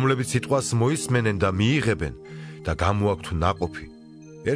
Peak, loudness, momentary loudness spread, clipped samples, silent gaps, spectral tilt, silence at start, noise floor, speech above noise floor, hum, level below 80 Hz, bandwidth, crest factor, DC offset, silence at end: -6 dBFS; -24 LUFS; 13 LU; under 0.1%; none; -5.5 dB/octave; 0 s; -44 dBFS; 21 dB; none; -42 dBFS; 11 kHz; 18 dB; under 0.1%; 0 s